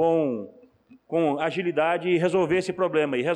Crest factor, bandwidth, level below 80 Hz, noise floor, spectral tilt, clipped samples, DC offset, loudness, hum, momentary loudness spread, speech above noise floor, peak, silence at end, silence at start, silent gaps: 12 dB; 10.5 kHz; -66 dBFS; -55 dBFS; -6.5 dB/octave; under 0.1%; under 0.1%; -24 LUFS; none; 7 LU; 31 dB; -12 dBFS; 0 s; 0 s; none